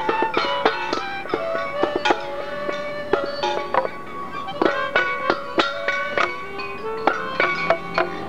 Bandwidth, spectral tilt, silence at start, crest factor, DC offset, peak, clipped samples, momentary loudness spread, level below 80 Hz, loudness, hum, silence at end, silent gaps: 15.5 kHz; -4 dB/octave; 0 s; 22 dB; 2%; -2 dBFS; under 0.1%; 9 LU; -58 dBFS; -23 LUFS; none; 0 s; none